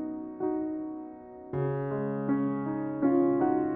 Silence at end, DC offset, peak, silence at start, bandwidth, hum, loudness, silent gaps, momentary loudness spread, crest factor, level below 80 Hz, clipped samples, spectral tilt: 0 s; under 0.1%; -14 dBFS; 0 s; 3.3 kHz; none; -30 LUFS; none; 13 LU; 14 dB; -64 dBFS; under 0.1%; -10.5 dB/octave